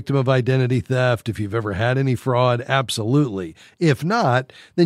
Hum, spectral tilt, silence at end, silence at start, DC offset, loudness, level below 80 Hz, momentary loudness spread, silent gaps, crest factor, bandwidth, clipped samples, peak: none; -6.5 dB/octave; 0 s; 0 s; under 0.1%; -20 LUFS; -56 dBFS; 6 LU; none; 18 dB; 13.5 kHz; under 0.1%; -2 dBFS